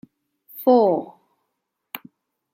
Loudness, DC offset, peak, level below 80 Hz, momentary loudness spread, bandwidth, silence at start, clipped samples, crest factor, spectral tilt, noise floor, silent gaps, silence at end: -19 LUFS; under 0.1%; -4 dBFS; -80 dBFS; 24 LU; 16.5 kHz; 0.55 s; under 0.1%; 20 dB; -7.5 dB/octave; -78 dBFS; none; 0.55 s